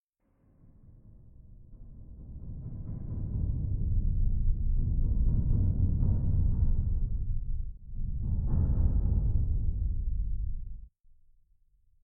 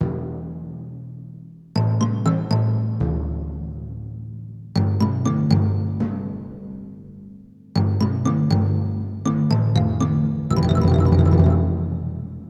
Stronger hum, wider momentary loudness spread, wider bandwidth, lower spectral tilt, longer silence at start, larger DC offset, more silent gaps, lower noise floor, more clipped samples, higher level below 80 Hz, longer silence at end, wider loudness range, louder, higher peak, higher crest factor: neither; second, 16 LU vs 19 LU; second, 1.4 kHz vs 8 kHz; first, -16 dB/octave vs -8.5 dB/octave; first, 1.45 s vs 0 s; neither; neither; first, -69 dBFS vs -43 dBFS; neither; first, -30 dBFS vs -36 dBFS; first, 1.15 s vs 0 s; first, 8 LU vs 5 LU; second, -32 LUFS vs -21 LUFS; second, -14 dBFS vs -2 dBFS; about the same, 14 dB vs 18 dB